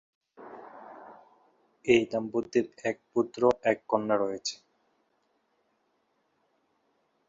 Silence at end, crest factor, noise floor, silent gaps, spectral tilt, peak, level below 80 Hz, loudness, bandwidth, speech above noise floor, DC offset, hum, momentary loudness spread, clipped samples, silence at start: 2.75 s; 24 dB; -74 dBFS; none; -4.5 dB/octave; -8 dBFS; -68 dBFS; -28 LUFS; 7.8 kHz; 46 dB; under 0.1%; none; 23 LU; under 0.1%; 0.4 s